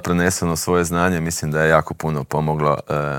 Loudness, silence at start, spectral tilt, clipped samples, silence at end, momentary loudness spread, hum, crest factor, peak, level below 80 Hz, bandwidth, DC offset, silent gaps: -19 LUFS; 0 s; -5 dB/octave; under 0.1%; 0 s; 6 LU; none; 18 dB; 0 dBFS; -44 dBFS; 18.5 kHz; under 0.1%; none